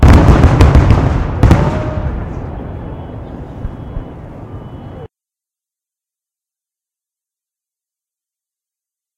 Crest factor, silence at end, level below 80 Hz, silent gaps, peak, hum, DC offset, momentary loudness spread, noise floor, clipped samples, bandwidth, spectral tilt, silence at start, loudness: 14 dB; 4.1 s; -18 dBFS; none; 0 dBFS; none; under 0.1%; 22 LU; -87 dBFS; 0.6%; 10 kHz; -8 dB/octave; 0 s; -11 LUFS